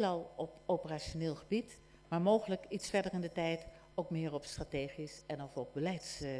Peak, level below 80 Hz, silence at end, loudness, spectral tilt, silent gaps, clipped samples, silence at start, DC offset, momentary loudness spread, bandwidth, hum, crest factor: -18 dBFS; -60 dBFS; 0 s; -39 LUFS; -5.5 dB/octave; none; under 0.1%; 0 s; under 0.1%; 11 LU; 11 kHz; none; 20 dB